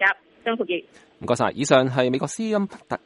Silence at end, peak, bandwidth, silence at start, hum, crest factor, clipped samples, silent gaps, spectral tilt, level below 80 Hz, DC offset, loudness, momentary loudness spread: 0.1 s; -2 dBFS; 11.5 kHz; 0 s; none; 22 dB; under 0.1%; none; -4.5 dB/octave; -64 dBFS; under 0.1%; -23 LUFS; 10 LU